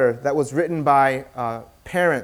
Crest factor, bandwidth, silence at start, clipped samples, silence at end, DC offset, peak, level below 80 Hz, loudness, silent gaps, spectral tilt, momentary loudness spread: 16 dB; 16.5 kHz; 0 s; under 0.1%; 0 s; under 0.1%; -4 dBFS; -56 dBFS; -21 LUFS; none; -6 dB/octave; 11 LU